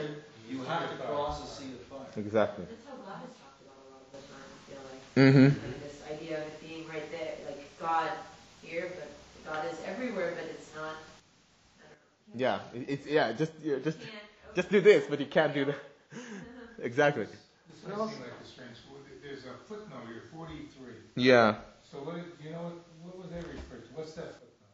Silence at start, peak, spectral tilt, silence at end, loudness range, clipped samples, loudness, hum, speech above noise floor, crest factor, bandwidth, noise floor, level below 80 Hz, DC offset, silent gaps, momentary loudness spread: 0 s; -8 dBFS; -6.5 dB/octave; 0.3 s; 10 LU; under 0.1%; -30 LUFS; none; 33 dB; 24 dB; 8 kHz; -64 dBFS; -62 dBFS; under 0.1%; none; 24 LU